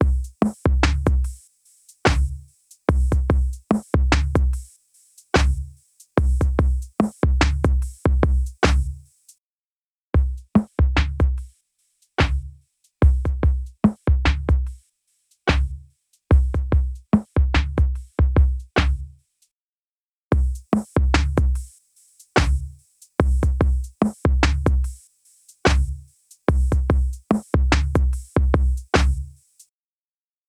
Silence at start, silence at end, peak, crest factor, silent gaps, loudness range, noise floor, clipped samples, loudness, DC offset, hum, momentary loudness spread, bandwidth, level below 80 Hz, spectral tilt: 0 s; 1.2 s; -2 dBFS; 20 dB; 9.38-10.13 s, 19.51-20.31 s; 2 LU; under -90 dBFS; under 0.1%; -22 LUFS; under 0.1%; none; 9 LU; 10.5 kHz; -22 dBFS; -6.5 dB/octave